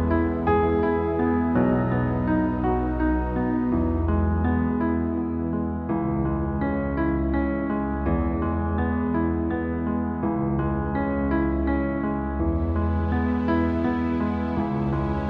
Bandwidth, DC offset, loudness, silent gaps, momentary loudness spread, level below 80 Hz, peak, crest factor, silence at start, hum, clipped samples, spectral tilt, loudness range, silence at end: 4.8 kHz; under 0.1%; -24 LUFS; none; 4 LU; -32 dBFS; -10 dBFS; 14 dB; 0 s; none; under 0.1%; -11 dB/octave; 2 LU; 0 s